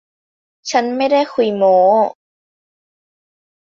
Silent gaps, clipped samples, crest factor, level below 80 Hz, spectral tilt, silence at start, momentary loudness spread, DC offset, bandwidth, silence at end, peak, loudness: none; under 0.1%; 16 dB; -68 dBFS; -4.5 dB/octave; 0.65 s; 8 LU; under 0.1%; 7.4 kHz; 1.5 s; -2 dBFS; -15 LUFS